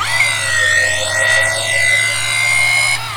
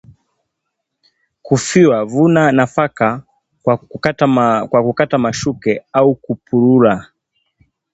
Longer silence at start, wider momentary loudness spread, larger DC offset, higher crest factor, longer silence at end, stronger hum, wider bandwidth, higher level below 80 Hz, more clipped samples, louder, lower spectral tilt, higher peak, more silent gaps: second, 0 s vs 1.45 s; second, 3 LU vs 8 LU; neither; about the same, 12 dB vs 16 dB; second, 0 s vs 0.9 s; neither; first, over 20 kHz vs 8.2 kHz; about the same, -48 dBFS vs -52 dBFS; neither; about the same, -12 LUFS vs -14 LUFS; second, 0 dB/octave vs -6 dB/octave; about the same, -2 dBFS vs 0 dBFS; neither